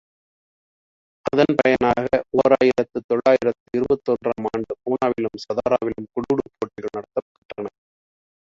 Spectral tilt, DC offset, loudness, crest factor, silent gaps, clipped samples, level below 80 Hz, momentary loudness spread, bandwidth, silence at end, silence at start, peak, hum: -7 dB/octave; under 0.1%; -21 LUFS; 20 dB; 3.04-3.09 s, 3.60-3.66 s, 7.22-7.49 s; under 0.1%; -54 dBFS; 14 LU; 7.6 kHz; 0.8 s; 1.25 s; -2 dBFS; none